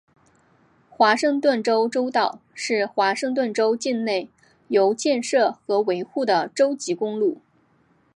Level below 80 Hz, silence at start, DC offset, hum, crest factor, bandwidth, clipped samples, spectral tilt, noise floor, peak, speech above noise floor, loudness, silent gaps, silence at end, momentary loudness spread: -76 dBFS; 1 s; under 0.1%; none; 18 dB; 11.5 kHz; under 0.1%; -3.5 dB/octave; -61 dBFS; -4 dBFS; 40 dB; -22 LUFS; none; 0.75 s; 6 LU